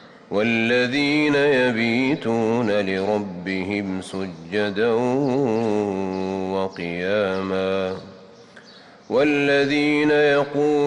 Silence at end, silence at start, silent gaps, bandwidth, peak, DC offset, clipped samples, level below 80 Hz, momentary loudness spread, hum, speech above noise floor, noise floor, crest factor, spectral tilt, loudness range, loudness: 0 s; 0 s; none; 10.5 kHz; -10 dBFS; under 0.1%; under 0.1%; -60 dBFS; 9 LU; none; 26 dB; -46 dBFS; 12 dB; -6 dB/octave; 4 LU; -21 LUFS